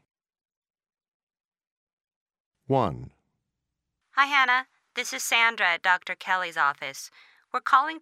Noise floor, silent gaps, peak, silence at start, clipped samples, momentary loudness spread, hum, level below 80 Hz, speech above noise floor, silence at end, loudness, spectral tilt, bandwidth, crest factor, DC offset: -84 dBFS; none; -6 dBFS; 2.7 s; under 0.1%; 14 LU; none; -64 dBFS; 59 dB; 0.05 s; -24 LUFS; -2.5 dB/octave; 16 kHz; 22 dB; under 0.1%